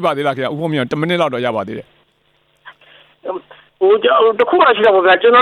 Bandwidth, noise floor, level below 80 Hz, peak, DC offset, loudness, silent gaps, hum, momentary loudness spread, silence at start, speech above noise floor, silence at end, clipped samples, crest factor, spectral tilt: 12 kHz; -59 dBFS; -60 dBFS; 0 dBFS; under 0.1%; -13 LUFS; none; none; 17 LU; 0 s; 46 dB; 0 s; under 0.1%; 14 dB; -6.5 dB/octave